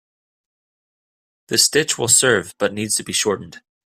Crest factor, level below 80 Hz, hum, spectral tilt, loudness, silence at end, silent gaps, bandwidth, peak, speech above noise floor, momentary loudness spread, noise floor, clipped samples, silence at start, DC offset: 20 dB; -60 dBFS; none; -1.5 dB/octave; -17 LUFS; 0.3 s; none; 16 kHz; 0 dBFS; over 71 dB; 10 LU; under -90 dBFS; under 0.1%; 1.5 s; under 0.1%